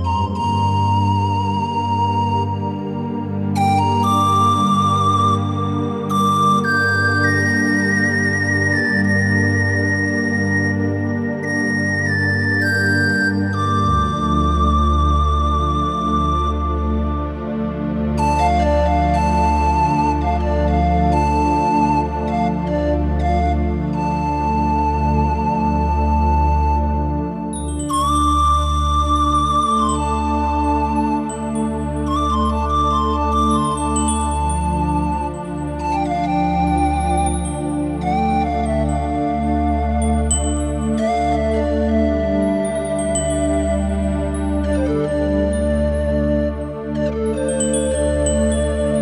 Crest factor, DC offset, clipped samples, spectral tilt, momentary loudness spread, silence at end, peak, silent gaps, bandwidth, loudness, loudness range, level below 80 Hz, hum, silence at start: 14 dB; 0.1%; under 0.1%; -6 dB/octave; 6 LU; 0 s; -4 dBFS; none; 11.5 kHz; -18 LUFS; 3 LU; -24 dBFS; none; 0 s